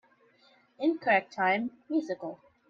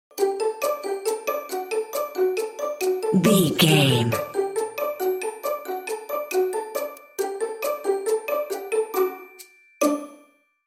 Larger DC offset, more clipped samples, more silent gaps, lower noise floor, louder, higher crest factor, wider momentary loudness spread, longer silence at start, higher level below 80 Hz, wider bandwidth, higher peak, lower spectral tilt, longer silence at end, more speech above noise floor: neither; neither; neither; first, -64 dBFS vs -57 dBFS; second, -29 LUFS vs -24 LUFS; about the same, 20 dB vs 20 dB; about the same, 12 LU vs 12 LU; first, 0.8 s vs 0.15 s; second, -80 dBFS vs -66 dBFS; second, 7.2 kHz vs 16.5 kHz; second, -12 dBFS vs -4 dBFS; about the same, -6 dB/octave vs -5 dB/octave; second, 0.35 s vs 0.5 s; about the same, 35 dB vs 38 dB